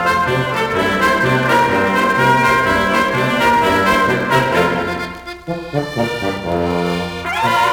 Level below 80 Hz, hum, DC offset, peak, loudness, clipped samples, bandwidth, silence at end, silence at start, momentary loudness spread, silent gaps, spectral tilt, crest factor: -42 dBFS; none; under 0.1%; -2 dBFS; -15 LUFS; under 0.1%; over 20 kHz; 0 s; 0 s; 9 LU; none; -5 dB/octave; 14 dB